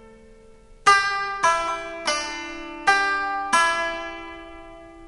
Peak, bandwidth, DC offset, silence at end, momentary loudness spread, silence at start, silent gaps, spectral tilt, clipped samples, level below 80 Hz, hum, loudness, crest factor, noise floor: -4 dBFS; 11.5 kHz; under 0.1%; 0 s; 19 LU; 0 s; none; -0.5 dB/octave; under 0.1%; -50 dBFS; none; -22 LUFS; 20 dB; -48 dBFS